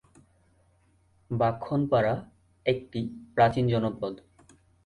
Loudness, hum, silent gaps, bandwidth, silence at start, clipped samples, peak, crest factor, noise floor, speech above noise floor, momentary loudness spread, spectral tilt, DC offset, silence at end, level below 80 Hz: -28 LUFS; none; none; 10.5 kHz; 1.3 s; under 0.1%; -8 dBFS; 20 dB; -65 dBFS; 38 dB; 12 LU; -8 dB/octave; under 0.1%; 0.7 s; -56 dBFS